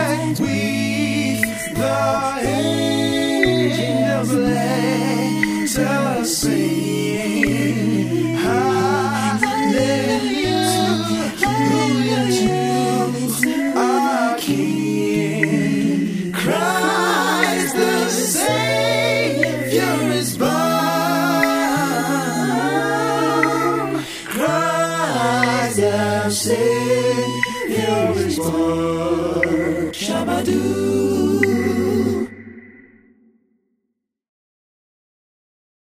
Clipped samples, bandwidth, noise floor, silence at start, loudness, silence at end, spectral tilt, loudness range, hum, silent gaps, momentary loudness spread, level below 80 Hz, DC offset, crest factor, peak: under 0.1%; 16 kHz; -76 dBFS; 0 s; -18 LUFS; 3.3 s; -4.5 dB/octave; 2 LU; none; none; 3 LU; -48 dBFS; under 0.1%; 18 dB; -2 dBFS